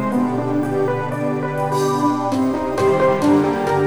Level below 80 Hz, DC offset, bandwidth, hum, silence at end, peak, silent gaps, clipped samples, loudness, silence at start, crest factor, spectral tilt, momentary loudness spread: -50 dBFS; 0.7%; over 20 kHz; none; 0 s; -6 dBFS; none; under 0.1%; -19 LUFS; 0 s; 12 dB; -7 dB/octave; 6 LU